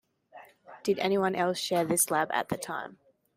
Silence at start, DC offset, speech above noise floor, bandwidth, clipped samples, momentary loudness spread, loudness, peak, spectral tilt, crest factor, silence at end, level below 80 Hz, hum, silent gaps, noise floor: 0.35 s; under 0.1%; 25 dB; 16 kHz; under 0.1%; 11 LU; -29 LUFS; -12 dBFS; -3.5 dB/octave; 18 dB; 0.45 s; -70 dBFS; none; none; -54 dBFS